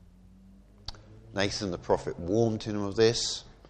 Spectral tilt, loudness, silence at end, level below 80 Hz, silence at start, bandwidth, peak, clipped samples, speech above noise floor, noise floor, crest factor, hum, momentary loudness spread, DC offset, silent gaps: -4.5 dB/octave; -29 LUFS; 0 s; -52 dBFS; 0.9 s; 9.6 kHz; -10 dBFS; under 0.1%; 26 dB; -54 dBFS; 20 dB; none; 20 LU; under 0.1%; none